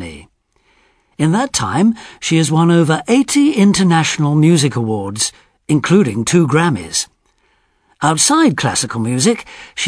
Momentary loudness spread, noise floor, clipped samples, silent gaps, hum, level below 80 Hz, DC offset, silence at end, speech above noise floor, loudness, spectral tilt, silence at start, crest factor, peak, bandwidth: 8 LU; -59 dBFS; under 0.1%; none; none; -50 dBFS; under 0.1%; 0 s; 45 dB; -14 LUFS; -4.5 dB/octave; 0 s; 14 dB; 0 dBFS; 11 kHz